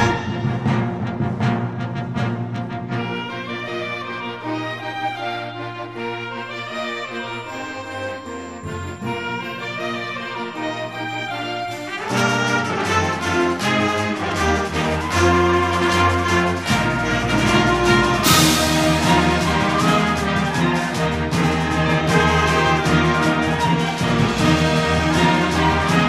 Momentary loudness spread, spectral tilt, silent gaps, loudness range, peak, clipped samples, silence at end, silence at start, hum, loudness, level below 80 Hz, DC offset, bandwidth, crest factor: 12 LU; -4.5 dB/octave; none; 11 LU; 0 dBFS; under 0.1%; 0 s; 0 s; none; -19 LUFS; -36 dBFS; 0.2%; 15.5 kHz; 18 dB